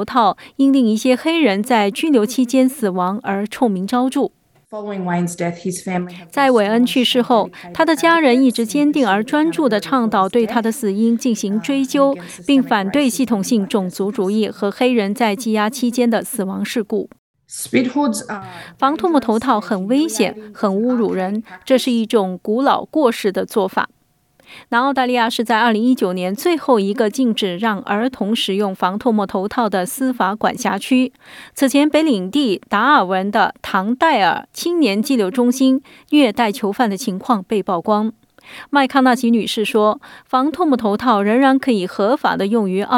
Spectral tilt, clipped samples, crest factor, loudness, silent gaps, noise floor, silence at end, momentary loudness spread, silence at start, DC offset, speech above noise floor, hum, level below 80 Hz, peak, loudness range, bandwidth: -5 dB/octave; under 0.1%; 14 dB; -17 LUFS; 17.18-17.34 s; -56 dBFS; 0 s; 8 LU; 0 s; under 0.1%; 40 dB; none; -62 dBFS; -2 dBFS; 4 LU; 17.5 kHz